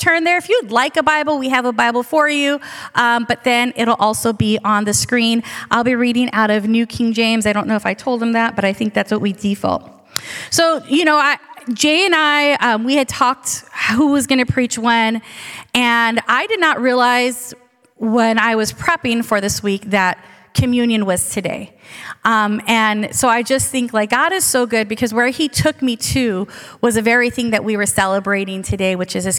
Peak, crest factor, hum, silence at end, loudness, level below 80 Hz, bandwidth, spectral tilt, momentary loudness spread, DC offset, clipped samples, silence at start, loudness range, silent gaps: 0 dBFS; 16 dB; none; 0 s; -16 LUFS; -46 dBFS; 17.5 kHz; -3.5 dB/octave; 7 LU; under 0.1%; under 0.1%; 0 s; 3 LU; none